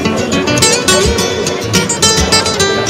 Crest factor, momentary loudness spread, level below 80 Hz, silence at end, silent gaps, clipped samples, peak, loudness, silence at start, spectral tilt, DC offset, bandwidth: 12 dB; 5 LU; -28 dBFS; 0 s; none; 0.1%; 0 dBFS; -10 LUFS; 0 s; -2.5 dB/octave; under 0.1%; over 20 kHz